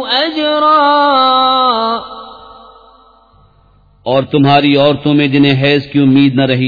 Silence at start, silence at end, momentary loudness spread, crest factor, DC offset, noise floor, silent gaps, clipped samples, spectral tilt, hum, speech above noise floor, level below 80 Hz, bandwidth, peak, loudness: 0 s; 0 s; 8 LU; 12 dB; under 0.1%; -48 dBFS; none; under 0.1%; -8 dB/octave; none; 38 dB; -48 dBFS; 5 kHz; 0 dBFS; -10 LUFS